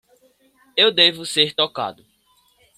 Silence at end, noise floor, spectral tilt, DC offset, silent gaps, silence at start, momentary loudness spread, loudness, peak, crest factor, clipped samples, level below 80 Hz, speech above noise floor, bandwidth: 0.85 s; -61 dBFS; -2.5 dB/octave; under 0.1%; none; 0.75 s; 14 LU; -17 LUFS; -2 dBFS; 20 dB; under 0.1%; -68 dBFS; 42 dB; 15 kHz